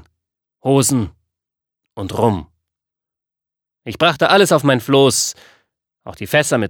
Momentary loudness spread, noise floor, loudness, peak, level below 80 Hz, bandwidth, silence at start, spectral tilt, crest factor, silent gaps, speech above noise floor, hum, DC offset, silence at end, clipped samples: 17 LU; -87 dBFS; -15 LUFS; 0 dBFS; -50 dBFS; 20 kHz; 0.65 s; -4 dB/octave; 18 dB; none; 71 dB; none; under 0.1%; 0 s; under 0.1%